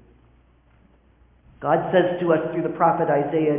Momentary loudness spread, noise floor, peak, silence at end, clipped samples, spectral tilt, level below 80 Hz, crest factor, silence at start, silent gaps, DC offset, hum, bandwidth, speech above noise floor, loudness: 5 LU; -56 dBFS; -6 dBFS; 0 s; under 0.1%; -11 dB/octave; -58 dBFS; 18 dB; 1.6 s; none; under 0.1%; none; 3.7 kHz; 36 dB; -21 LUFS